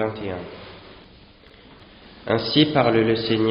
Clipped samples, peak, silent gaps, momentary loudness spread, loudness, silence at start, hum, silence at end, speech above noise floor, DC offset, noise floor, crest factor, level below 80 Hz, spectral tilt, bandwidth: under 0.1%; -4 dBFS; none; 23 LU; -20 LUFS; 0 s; none; 0 s; 28 dB; under 0.1%; -49 dBFS; 20 dB; -52 dBFS; -4 dB/octave; 5.4 kHz